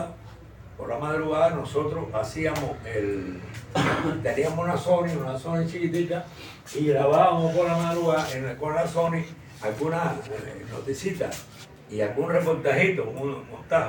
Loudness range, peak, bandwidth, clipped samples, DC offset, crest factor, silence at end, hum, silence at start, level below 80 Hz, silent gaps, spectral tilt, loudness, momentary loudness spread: 5 LU; -8 dBFS; 17 kHz; under 0.1%; under 0.1%; 18 dB; 0 s; none; 0 s; -54 dBFS; none; -6 dB/octave; -26 LUFS; 15 LU